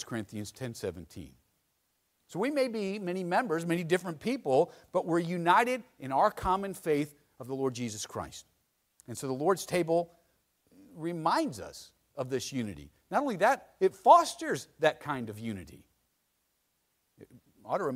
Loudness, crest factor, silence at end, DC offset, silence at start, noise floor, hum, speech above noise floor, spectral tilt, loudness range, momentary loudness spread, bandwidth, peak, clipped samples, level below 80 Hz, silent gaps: -30 LUFS; 24 dB; 0 s; under 0.1%; 0 s; -77 dBFS; none; 47 dB; -5 dB/octave; 7 LU; 17 LU; 16 kHz; -8 dBFS; under 0.1%; -62 dBFS; none